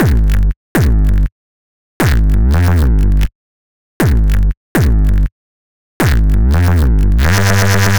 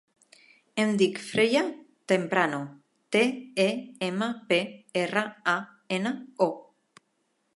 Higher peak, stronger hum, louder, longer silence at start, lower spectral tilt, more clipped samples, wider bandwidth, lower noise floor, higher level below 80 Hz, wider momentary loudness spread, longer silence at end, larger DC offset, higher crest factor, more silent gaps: first, 0 dBFS vs -8 dBFS; neither; first, -13 LUFS vs -27 LUFS; second, 0 s vs 0.75 s; about the same, -6 dB/octave vs -5 dB/octave; neither; first, over 20 kHz vs 11.5 kHz; first, under -90 dBFS vs -74 dBFS; first, -14 dBFS vs -76 dBFS; second, 5 LU vs 9 LU; second, 0 s vs 0.95 s; first, 6% vs under 0.1%; second, 10 dB vs 20 dB; first, 0.56-0.75 s, 1.32-2.00 s, 3.35-4.00 s, 4.57-4.75 s, 5.32-6.00 s vs none